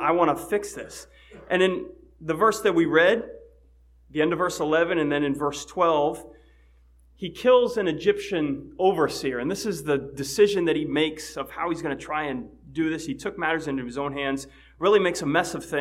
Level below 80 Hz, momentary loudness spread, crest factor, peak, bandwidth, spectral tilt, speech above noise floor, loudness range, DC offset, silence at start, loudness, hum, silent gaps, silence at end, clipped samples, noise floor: -54 dBFS; 14 LU; 20 dB; -6 dBFS; 15.5 kHz; -4.5 dB/octave; 32 dB; 4 LU; under 0.1%; 0 s; -24 LUFS; none; none; 0 s; under 0.1%; -56 dBFS